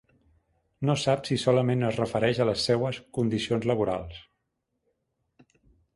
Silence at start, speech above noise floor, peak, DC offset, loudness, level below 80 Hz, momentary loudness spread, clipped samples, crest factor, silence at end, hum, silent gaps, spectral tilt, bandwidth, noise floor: 0.8 s; 54 dB; -8 dBFS; under 0.1%; -26 LUFS; -56 dBFS; 7 LU; under 0.1%; 20 dB; 1.75 s; none; none; -6 dB/octave; 11.5 kHz; -79 dBFS